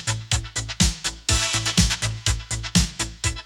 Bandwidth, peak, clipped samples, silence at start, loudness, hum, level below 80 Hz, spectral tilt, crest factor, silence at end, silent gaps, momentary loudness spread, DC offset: 18 kHz; -2 dBFS; under 0.1%; 0 s; -22 LUFS; none; -30 dBFS; -2.5 dB/octave; 22 dB; 0 s; none; 6 LU; under 0.1%